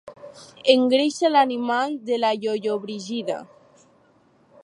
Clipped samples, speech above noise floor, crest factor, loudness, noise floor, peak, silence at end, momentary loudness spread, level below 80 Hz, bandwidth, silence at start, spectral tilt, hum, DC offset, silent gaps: under 0.1%; 37 dB; 22 dB; -22 LUFS; -59 dBFS; -2 dBFS; 1.2 s; 14 LU; -76 dBFS; 11 kHz; 0.05 s; -4 dB/octave; none; under 0.1%; none